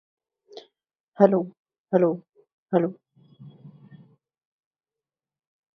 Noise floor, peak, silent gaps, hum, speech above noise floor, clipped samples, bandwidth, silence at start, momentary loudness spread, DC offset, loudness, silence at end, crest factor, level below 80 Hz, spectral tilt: under -90 dBFS; -2 dBFS; 1.00-1.12 s, 1.59-1.65 s, 1.80-1.85 s, 2.53-2.66 s; none; over 69 dB; under 0.1%; 6 kHz; 0.55 s; 27 LU; under 0.1%; -23 LUFS; 2.1 s; 26 dB; -78 dBFS; -10 dB/octave